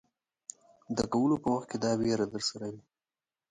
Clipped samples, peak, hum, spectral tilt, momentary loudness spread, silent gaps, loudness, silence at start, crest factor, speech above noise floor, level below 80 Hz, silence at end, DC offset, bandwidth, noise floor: under 0.1%; -14 dBFS; none; -5 dB/octave; 19 LU; none; -31 LUFS; 0.9 s; 18 dB; over 60 dB; -62 dBFS; 0.7 s; under 0.1%; 9.6 kHz; under -90 dBFS